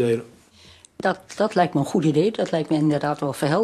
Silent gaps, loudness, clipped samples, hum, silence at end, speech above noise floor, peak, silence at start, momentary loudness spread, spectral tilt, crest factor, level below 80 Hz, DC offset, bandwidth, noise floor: none; -22 LUFS; under 0.1%; none; 0 s; 29 dB; -6 dBFS; 0 s; 5 LU; -6.5 dB/octave; 16 dB; -62 dBFS; under 0.1%; 13 kHz; -50 dBFS